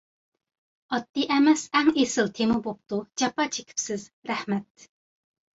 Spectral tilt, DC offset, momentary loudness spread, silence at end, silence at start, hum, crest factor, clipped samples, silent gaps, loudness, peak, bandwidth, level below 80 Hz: -3.5 dB/octave; under 0.1%; 11 LU; 0.95 s; 0.9 s; none; 18 dB; under 0.1%; 4.13-4.22 s; -26 LUFS; -8 dBFS; 8 kHz; -64 dBFS